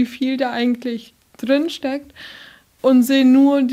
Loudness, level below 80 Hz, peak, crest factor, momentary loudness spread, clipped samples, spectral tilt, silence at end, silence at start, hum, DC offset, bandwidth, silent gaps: -17 LUFS; -62 dBFS; -4 dBFS; 12 dB; 18 LU; under 0.1%; -4.5 dB/octave; 0 s; 0 s; none; under 0.1%; 15.5 kHz; none